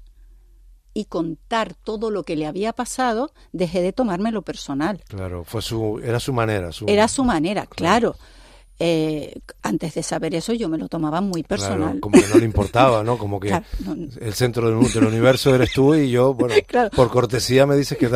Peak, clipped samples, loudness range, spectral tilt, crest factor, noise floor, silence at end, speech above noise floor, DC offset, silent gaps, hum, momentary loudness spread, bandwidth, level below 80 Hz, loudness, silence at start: 0 dBFS; under 0.1%; 7 LU; -5.5 dB/octave; 18 dB; -49 dBFS; 0 s; 29 dB; under 0.1%; none; none; 12 LU; 15.5 kHz; -42 dBFS; -20 LUFS; 0 s